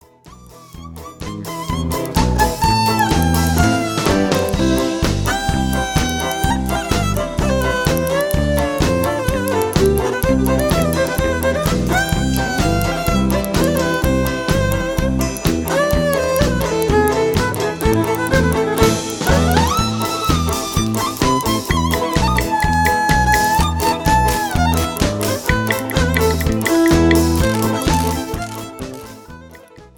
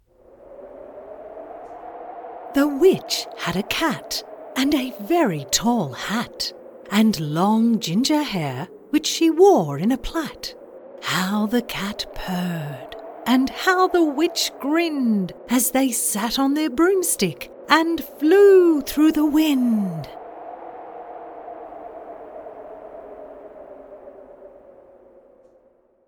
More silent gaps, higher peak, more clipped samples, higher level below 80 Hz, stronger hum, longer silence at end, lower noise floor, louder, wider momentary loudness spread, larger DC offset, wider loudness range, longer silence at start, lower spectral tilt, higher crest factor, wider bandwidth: neither; about the same, 0 dBFS vs 0 dBFS; neither; first, -26 dBFS vs -50 dBFS; neither; second, 0.1 s vs 1.6 s; second, -42 dBFS vs -58 dBFS; first, -17 LUFS vs -20 LUFS; second, 5 LU vs 21 LU; first, 0.4% vs under 0.1%; second, 2 LU vs 20 LU; second, 0.25 s vs 0.5 s; about the same, -5 dB/octave vs -4 dB/octave; second, 16 dB vs 22 dB; about the same, 19.5 kHz vs 19 kHz